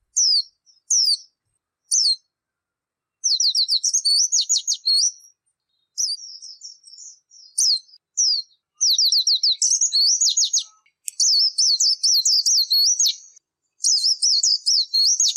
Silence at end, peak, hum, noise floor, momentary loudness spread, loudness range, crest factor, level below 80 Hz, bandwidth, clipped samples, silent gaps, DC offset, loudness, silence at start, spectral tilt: 0 s; -6 dBFS; none; -86 dBFS; 10 LU; 7 LU; 14 dB; under -90 dBFS; 15.5 kHz; under 0.1%; none; under 0.1%; -17 LUFS; 0.15 s; 10.5 dB/octave